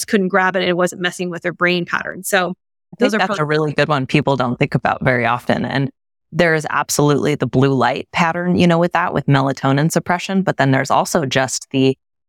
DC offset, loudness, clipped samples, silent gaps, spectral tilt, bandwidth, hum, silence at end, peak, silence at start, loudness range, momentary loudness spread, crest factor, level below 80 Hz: under 0.1%; -17 LUFS; under 0.1%; none; -5 dB/octave; 17.5 kHz; none; 0.35 s; -2 dBFS; 0 s; 2 LU; 5 LU; 14 dB; -52 dBFS